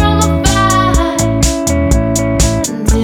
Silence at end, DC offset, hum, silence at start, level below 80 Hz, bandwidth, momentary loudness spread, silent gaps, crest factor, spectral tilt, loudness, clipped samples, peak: 0 s; under 0.1%; none; 0 s; -18 dBFS; 18 kHz; 3 LU; none; 12 dB; -4.5 dB/octave; -12 LUFS; under 0.1%; 0 dBFS